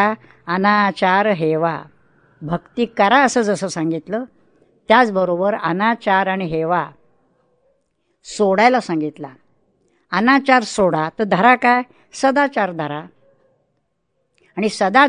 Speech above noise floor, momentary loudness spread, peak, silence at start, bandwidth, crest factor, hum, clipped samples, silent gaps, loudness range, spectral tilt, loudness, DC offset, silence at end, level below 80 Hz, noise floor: 53 dB; 14 LU; 0 dBFS; 0 s; 10.5 kHz; 18 dB; none; under 0.1%; none; 5 LU; -5 dB/octave; -17 LUFS; under 0.1%; 0 s; -58 dBFS; -70 dBFS